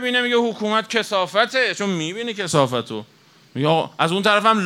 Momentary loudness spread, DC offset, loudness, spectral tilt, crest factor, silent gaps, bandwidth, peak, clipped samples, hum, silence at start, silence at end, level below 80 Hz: 9 LU; under 0.1%; -20 LUFS; -4 dB/octave; 18 dB; none; 16 kHz; -2 dBFS; under 0.1%; none; 0 s; 0 s; -72 dBFS